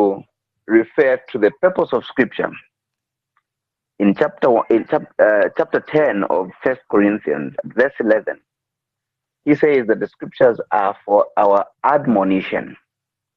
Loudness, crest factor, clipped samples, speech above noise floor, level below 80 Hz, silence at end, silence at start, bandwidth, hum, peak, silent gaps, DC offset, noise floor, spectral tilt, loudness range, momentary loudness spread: -17 LUFS; 16 dB; under 0.1%; 66 dB; -60 dBFS; 0.6 s; 0 s; 6 kHz; none; -2 dBFS; none; under 0.1%; -83 dBFS; -8.5 dB/octave; 3 LU; 9 LU